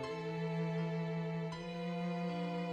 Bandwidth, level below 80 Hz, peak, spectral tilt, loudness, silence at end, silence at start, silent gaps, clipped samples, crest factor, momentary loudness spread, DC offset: 8.8 kHz; -70 dBFS; -28 dBFS; -7.5 dB/octave; -39 LUFS; 0 s; 0 s; none; under 0.1%; 10 dB; 4 LU; under 0.1%